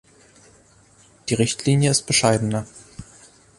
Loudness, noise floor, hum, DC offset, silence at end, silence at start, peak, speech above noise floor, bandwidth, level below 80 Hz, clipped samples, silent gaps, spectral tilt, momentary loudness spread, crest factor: -20 LUFS; -54 dBFS; none; under 0.1%; 0.55 s; 1.25 s; -2 dBFS; 34 dB; 11.5 kHz; -52 dBFS; under 0.1%; none; -4 dB/octave; 24 LU; 20 dB